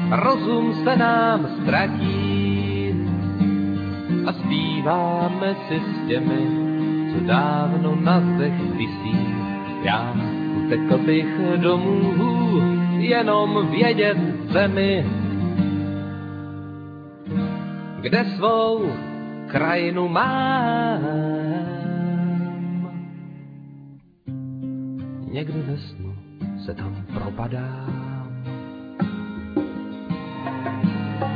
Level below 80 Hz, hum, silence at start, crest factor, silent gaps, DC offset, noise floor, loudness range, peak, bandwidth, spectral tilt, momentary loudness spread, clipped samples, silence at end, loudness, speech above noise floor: -54 dBFS; none; 0 s; 18 dB; none; under 0.1%; -45 dBFS; 11 LU; -4 dBFS; 5 kHz; -9.5 dB/octave; 13 LU; under 0.1%; 0 s; -22 LUFS; 25 dB